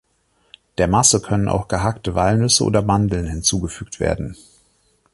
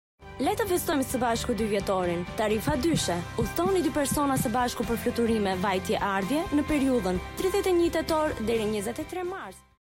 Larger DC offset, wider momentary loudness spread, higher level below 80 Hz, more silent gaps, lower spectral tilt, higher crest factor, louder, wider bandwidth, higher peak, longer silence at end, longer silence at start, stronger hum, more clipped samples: neither; first, 11 LU vs 6 LU; first, -36 dBFS vs -44 dBFS; neither; about the same, -4 dB/octave vs -5 dB/octave; first, 18 dB vs 12 dB; first, -18 LUFS vs -27 LUFS; second, 11.5 kHz vs 16.5 kHz; first, -2 dBFS vs -16 dBFS; first, 0.8 s vs 0.25 s; first, 0.8 s vs 0.2 s; neither; neither